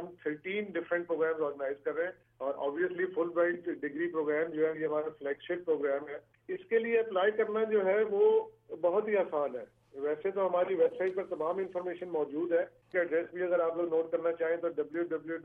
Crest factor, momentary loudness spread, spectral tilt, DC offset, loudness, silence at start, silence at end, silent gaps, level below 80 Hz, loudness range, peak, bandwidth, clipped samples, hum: 14 dB; 9 LU; -8 dB/octave; under 0.1%; -32 LUFS; 0 s; 0 s; none; -78 dBFS; 3 LU; -16 dBFS; 3.7 kHz; under 0.1%; none